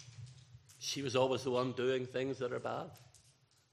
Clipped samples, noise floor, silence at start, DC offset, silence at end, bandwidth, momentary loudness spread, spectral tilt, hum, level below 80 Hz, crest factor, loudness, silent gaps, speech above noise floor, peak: under 0.1%; -69 dBFS; 0 s; under 0.1%; 0.55 s; 14 kHz; 19 LU; -4.5 dB/octave; none; -78 dBFS; 20 dB; -37 LUFS; none; 33 dB; -18 dBFS